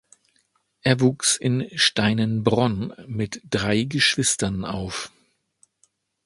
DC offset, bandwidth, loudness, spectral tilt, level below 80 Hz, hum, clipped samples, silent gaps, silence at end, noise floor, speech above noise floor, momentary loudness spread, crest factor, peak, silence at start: under 0.1%; 11.5 kHz; -22 LUFS; -4 dB/octave; -50 dBFS; none; under 0.1%; none; 1.15 s; -68 dBFS; 45 dB; 11 LU; 22 dB; -2 dBFS; 0.85 s